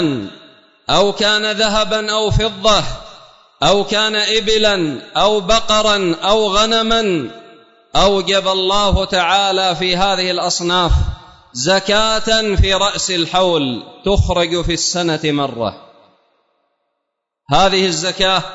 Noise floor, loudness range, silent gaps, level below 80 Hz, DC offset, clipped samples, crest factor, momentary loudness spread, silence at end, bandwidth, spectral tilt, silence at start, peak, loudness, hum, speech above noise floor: -76 dBFS; 5 LU; none; -28 dBFS; under 0.1%; under 0.1%; 14 dB; 8 LU; 0 s; 8 kHz; -3.5 dB/octave; 0 s; -2 dBFS; -15 LUFS; none; 61 dB